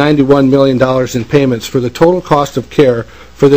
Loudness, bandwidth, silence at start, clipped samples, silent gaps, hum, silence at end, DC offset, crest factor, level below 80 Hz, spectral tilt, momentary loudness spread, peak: -11 LUFS; 16 kHz; 0 s; 2%; none; none; 0 s; 1%; 10 dB; -38 dBFS; -6.5 dB/octave; 7 LU; 0 dBFS